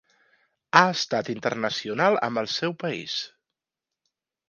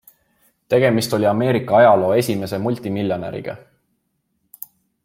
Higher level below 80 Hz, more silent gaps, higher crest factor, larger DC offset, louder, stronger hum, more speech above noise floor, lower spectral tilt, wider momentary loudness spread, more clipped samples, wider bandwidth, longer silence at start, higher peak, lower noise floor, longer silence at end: second, -72 dBFS vs -60 dBFS; neither; first, 26 dB vs 16 dB; neither; second, -24 LUFS vs -18 LUFS; neither; first, 64 dB vs 53 dB; second, -4 dB/octave vs -6 dB/octave; second, 12 LU vs 24 LU; neither; second, 10 kHz vs 16.5 kHz; about the same, 0.75 s vs 0.7 s; about the same, 0 dBFS vs -2 dBFS; first, -88 dBFS vs -70 dBFS; second, 1.2 s vs 1.45 s